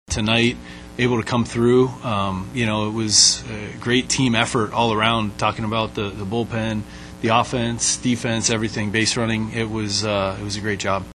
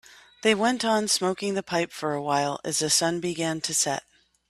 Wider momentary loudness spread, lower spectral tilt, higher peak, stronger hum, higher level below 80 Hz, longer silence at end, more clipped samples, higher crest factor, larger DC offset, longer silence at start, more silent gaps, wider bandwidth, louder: about the same, 8 LU vs 6 LU; about the same, -3.5 dB/octave vs -2.5 dB/octave; first, 0 dBFS vs -6 dBFS; neither; first, -42 dBFS vs -66 dBFS; second, 0 s vs 0.5 s; neither; about the same, 20 dB vs 20 dB; neither; second, 0.1 s vs 0.45 s; neither; second, 12 kHz vs 15.5 kHz; first, -20 LUFS vs -25 LUFS